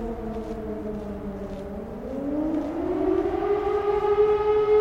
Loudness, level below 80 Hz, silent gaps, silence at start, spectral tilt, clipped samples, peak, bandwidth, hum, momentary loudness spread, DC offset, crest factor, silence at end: -26 LUFS; -42 dBFS; none; 0 s; -8 dB/octave; under 0.1%; -10 dBFS; 6.8 kHz; none; 13 LU; under 0.1%; 14 dB; 0 s